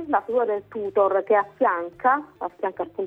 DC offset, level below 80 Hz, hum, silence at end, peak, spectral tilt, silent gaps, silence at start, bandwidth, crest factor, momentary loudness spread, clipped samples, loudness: under 0.1%; -68 dBFS; none; 0 s; -8 dBFS; -7.5 dB/octave; none; 0 s; 4 kHz; 16 dB; 9 LU; under 0.1%; -23 LUFS